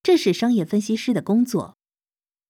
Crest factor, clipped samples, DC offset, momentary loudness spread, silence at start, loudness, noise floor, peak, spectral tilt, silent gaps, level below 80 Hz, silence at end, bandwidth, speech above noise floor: 16 dB; under 0.1%; under 0.1%; 7 LU; 0.05 s; -21 LUFS; under -90 dBFS; -6 dBFS; -6 dB/octave; none; -68 dBFS; 0.85 s; 15.5 kHz; over 70 dB